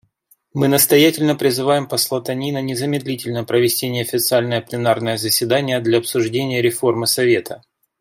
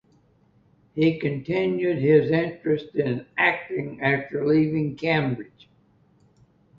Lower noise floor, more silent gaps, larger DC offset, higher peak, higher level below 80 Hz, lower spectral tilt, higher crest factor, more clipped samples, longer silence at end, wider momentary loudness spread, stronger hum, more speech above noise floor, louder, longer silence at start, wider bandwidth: about the same, -59 dBFS vs -61 dBFS; neither; neither; about the same, -2 dBFS vs -4 dBFS; about the same, -60 dBFS vs -60 dBFS; second, -4 dB/octave vs -9 dB/octave; about the same, 16 dB vs 20 dB; neither; second, 0.45 s vs 1.35 s; about the same, 8 LU vs 10 LU; neither; about the same, 41 dB vs 38 dB; first, -17 LUFS vs -23 LUFS; second, 0.55 s vs 0.95 s; first, 16.5 kHz vs 6.8 kHz